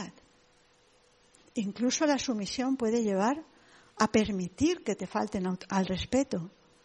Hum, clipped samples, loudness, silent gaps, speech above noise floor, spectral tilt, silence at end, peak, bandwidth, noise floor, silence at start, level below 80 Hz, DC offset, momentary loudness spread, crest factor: none; under 0.1%; -30 LUFS; none; 35 dB; -4.5 dB/octave; 0.35 s; -10 dBFS; 11 kHz; -64 dBFS; 0 s; -58 dBFS; under 0.1%; 9 LU; 22 dB